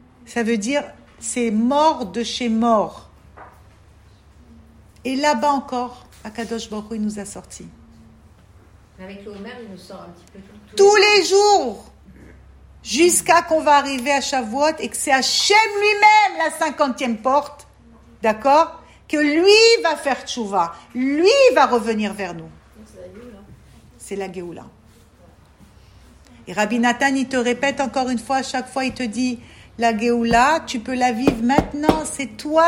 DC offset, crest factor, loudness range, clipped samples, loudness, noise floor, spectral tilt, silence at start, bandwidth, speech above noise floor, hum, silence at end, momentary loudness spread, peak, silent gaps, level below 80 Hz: under 0.1%; 20 dB; 16 LU; under 0.1%; -18 LUFS; -49 dBFS; -3 dB/octave; 0.3 s; 16 kHz; 31 dB; none; 0 s; 22 LU; 0 dBFS; none; -48 dBFS